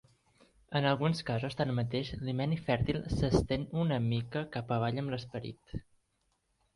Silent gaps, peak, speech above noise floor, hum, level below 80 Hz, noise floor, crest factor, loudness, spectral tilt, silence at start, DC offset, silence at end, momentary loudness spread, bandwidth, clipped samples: none; -14 dBFS; 45 dB; none; -50 dBFS; -77 dBFS; 20 dB; -33 LUFS; -7 dB/octave; 0.7 s; under 0.1%; 0.95 s; 11 LU; 11.5 kHz; under 0.1%